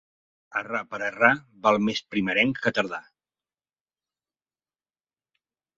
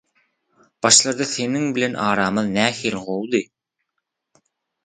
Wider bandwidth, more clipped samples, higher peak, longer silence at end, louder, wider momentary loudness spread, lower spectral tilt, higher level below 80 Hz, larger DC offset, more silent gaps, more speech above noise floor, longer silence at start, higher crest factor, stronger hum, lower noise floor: second, 7.8 kHz vs 9.6 kHz; neither; about the same, -2 dBFS vs 0 dBFS; first, 2.75 s vs 1.4 s; second, -24 LUFS vs -19 LUFS; about the same, 11 LU vs 11 LU; first, -5 dB/octave vs -2.5 dB/octave; second, -66 dBFS vs -60 dBFS; neither; neither; first, over 65 dB vs 59 dB; second, 0.5 s vs 0.85 s; about the same, 26 dB vs 22 dB; neither; first, under -90 dBFS vs -78 dBFS